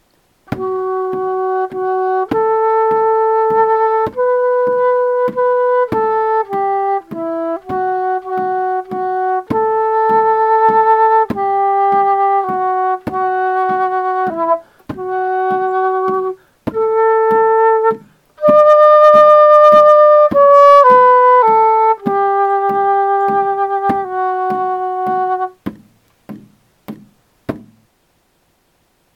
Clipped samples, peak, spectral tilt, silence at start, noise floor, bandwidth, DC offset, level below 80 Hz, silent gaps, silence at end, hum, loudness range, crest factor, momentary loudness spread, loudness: 0.2%; 0 dBFS; -7 dB/octave; 0.5 s; -59 dBFS; 7 kHz; under 0.1%; -56 dBFS; none; 1.55 s; none; 10 LU; 12 dB; 13 LU; -13 LUFS